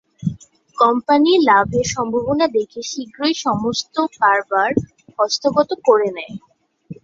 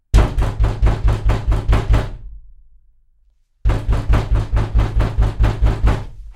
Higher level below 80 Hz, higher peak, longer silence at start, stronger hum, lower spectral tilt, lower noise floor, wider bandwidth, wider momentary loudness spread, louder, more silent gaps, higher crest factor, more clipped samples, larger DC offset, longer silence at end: second, -50 dBFS vs -18 dBFS; about the same, -2 dBFS vs 0 dBFS; about the same, 0.2 s vs 0.15 s; neither; second, -4.5 dB/octave vs -7 dB/octave; second, -39 dBFS vs -56 dBFS; second, 7.8 kHz vs 9.2 kHz; first, 13 LU vs 5 LU; about the same, -17 LUFS vs -19 LUFS; neither; about the same, 16 dB vs 16 dB; neither; neither; about the same, 0.1 s vs 0.05 s